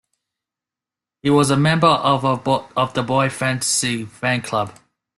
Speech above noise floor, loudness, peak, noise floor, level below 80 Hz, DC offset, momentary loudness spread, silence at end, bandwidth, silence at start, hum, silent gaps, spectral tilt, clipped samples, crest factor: 70 dB; -18 LUFS; -2 dBFS; -88 dBFS; -56 dBFS; under 0.1%; 8 LU; 0.45 s; 12.5 kHz; 1.25 s; none; none; -4.5 dB/octave; under 0.1%; 18 dB